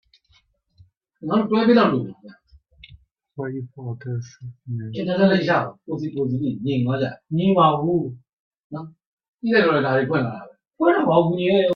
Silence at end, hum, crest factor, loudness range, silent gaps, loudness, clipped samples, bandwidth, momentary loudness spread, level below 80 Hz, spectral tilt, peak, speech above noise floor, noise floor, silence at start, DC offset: 0 s; none; 18 dB; 4 LU; 8.33-8.51 s, 8.64-8.70 s, 9.06-9.17 s, 9.28-9.33 s; -21 LUFS; under 0.1%; 6.6 kHz; 19 LU; -60 dBFS; -8.5 dB/octave; -2 dBFS; 41 dB; -62 dBFS; 1.2 s; under 0.1%